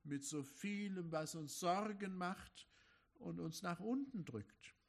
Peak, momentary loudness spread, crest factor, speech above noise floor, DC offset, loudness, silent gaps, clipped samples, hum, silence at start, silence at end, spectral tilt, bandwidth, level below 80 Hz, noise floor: -26 dBFS; 14 LU; 20 dB; 27 dB; under 0.1%; -45 LUFS; none; under 0.1%; none; 0.05 s; 0.15 s; -5 dB/octave; 13.5 kHz; -78 dBFS; -73 dBFS